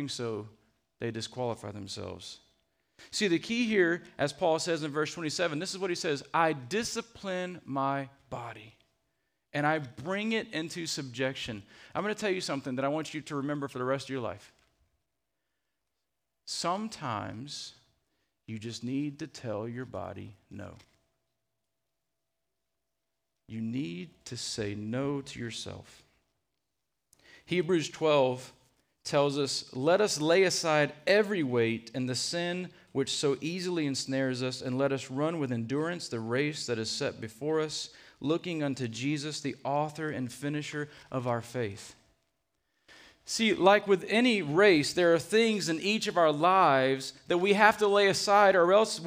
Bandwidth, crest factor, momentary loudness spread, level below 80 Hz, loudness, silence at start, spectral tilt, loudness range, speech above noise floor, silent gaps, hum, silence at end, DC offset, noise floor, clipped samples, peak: 15.5 kHz; 26 dB; 16 LU; -70 dBFS; -30 LUFS; 0 s; -4.5 dB/octave; 14 LU; 56 dB; none; none; 0 s; under 0.1%; -86 dBFS; under 0.1%; -6 dBFS